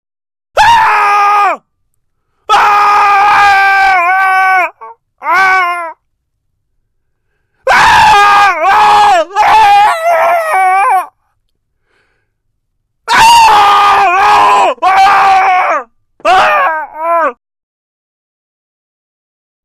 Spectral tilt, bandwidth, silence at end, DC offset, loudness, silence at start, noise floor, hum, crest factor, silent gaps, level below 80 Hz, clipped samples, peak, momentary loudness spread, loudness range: -1.5 dB/octave; 14 kHz; 2.35 s; under 0.1%; -7 LUFS; 0.55 s; -64 dBFS; none; 10 dB; none; -42 dBFS; under 0.1%; 0 dBFS; 10 LU; 7 LU